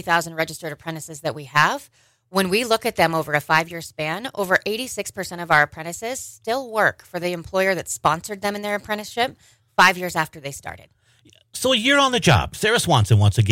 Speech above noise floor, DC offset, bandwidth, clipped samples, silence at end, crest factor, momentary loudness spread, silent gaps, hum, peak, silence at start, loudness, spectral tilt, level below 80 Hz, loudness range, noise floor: 34 dB; under 0.1%; 16.5 kHz; under 0.1%; 0 s; 18 dB; 14 LU; none; none; -4 dBFS; 0.05 s; -21 LUFS; -4 dB/octave; -50 dBFS; 4 LU; -55 dBFS